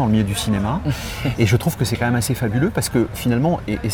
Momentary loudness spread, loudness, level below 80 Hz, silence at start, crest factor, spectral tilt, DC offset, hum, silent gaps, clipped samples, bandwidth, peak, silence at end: 5 LU; -20 LUFS; -36 dBFS; 0 s; 16 dB; -5.5 dB/octave; under 0.1%; none; none; under 0.1%; over 20 kHz; -4 dBFS; 0 s